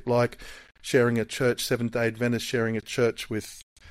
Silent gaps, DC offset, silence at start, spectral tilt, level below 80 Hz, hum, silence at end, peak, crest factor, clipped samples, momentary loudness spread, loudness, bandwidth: 3.63-3.76 s; under 0.1%; 0.05 s; -5 dB/octave; -54 dBFS; none; 0 s; -10 dBFS; 18 dB; under 0.1%; 17 LU; -26 LUFS; 16 kHz